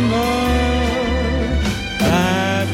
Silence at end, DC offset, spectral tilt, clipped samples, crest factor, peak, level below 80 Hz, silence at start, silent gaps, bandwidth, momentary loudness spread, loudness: 0 s; under 0.1%; -5.5 dB/octave; under 0.1%; 12 dB; -4 dBFS; -24 dBFS; 0 s; none; 16.5 kHz; 3 LU; -18 LUFS